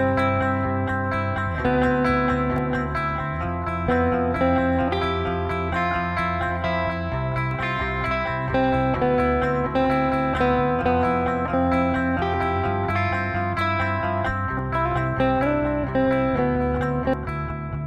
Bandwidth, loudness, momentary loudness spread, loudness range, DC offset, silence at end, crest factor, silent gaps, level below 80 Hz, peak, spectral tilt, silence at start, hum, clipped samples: 9.4 kHz; -23 LUFS; 4 LU; 2 LU; under 0.1%; 0 s; 14 dB; none; -36 dBFS; -8 dBFS; -8 dB/octave; 0 s; none; under 0.1%